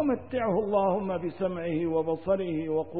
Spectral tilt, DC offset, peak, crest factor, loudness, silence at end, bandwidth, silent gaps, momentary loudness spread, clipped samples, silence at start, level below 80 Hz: -11.5 dB/octave; 0.3%; -14 dBFS; 14 dB; -29 LUFS; 0 s; 4.7 kHz; none; 5 LU; under 0.1%; 0 s; -60 dBFS